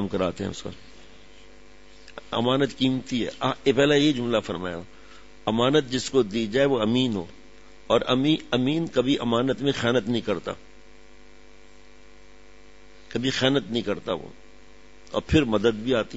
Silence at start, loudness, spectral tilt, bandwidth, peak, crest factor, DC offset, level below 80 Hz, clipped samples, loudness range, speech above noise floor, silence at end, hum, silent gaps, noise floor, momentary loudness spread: 0 s; -24 LUFS; -5.5 dB/octave; 8 kHz; -6 dBFS; 20 dB; 0.5%; -52 dBFS; under 0.1%; 6 LU; 29 dB; 0 s; none; none; -52 dBFS; 12 LU